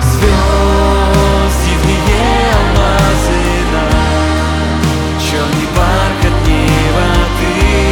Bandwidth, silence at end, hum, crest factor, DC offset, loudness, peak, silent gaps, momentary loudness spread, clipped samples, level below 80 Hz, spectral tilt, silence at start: 18.5 kHz; 0 s; none; 10 dB; under 0.1%; -11 LUFS; 0 dBFS; none; 3 LU; under 0.1%; -14 dBFS; -5.5 dB/octave; 0 s